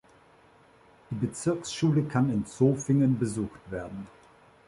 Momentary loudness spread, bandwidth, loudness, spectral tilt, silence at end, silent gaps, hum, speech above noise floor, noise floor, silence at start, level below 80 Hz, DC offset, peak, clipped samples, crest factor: 15 LU; 11.5 kHz; -28 LUFS; -7 dB/octave; 0.6 s; none; none; 31 dB; -58 dBFS; 1.1 s; -58 dBFS; under 0.1%; -10 dBFS; under 0.1%; 18 dB